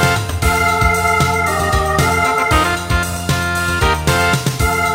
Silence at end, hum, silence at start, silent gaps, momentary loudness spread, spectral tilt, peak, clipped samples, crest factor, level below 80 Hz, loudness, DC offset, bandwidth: 0 s; none; 0 s; none; 4 LU; -4 dB/octave; 0 dBFS; under 0.1%; 14 dB; -24 dBFS; -15 LUFS; under 0.1%; 16.5 kHz